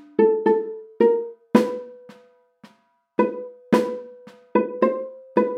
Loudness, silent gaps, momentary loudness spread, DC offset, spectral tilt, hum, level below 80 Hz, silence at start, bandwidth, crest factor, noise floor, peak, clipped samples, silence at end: -22 LUFS; none; 15 LU; under 0.1%; -7 dB/octave; none; -76 dBFS; 0.2 s; 13.5 kHz; 22 dB; -62 dBFS; 0 dBFS; under 0.1%; 0 s